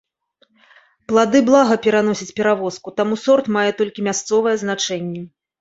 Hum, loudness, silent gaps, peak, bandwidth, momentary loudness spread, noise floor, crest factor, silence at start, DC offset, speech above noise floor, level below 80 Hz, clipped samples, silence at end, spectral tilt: none; -17 LUFS; none; -2 dBFS; 8 kHz; 9 LU; -61 dBFS; 16 dB; 1.1 s; under 0.1%; 44 dB; -62 dBFS; under 0.1%; 0.35 s; -4.5 dB/octave